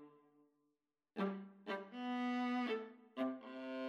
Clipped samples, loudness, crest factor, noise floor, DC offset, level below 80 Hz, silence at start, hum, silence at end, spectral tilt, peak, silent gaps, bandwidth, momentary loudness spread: under 0.1%; -43 LUFS; 16 dB; -88 dBFS; under 0.1%; under -90 dBFS; 0 s; none; 0 s; -6.5 dB/octave; -28 dBFS; none; 7 kHz; 10 LU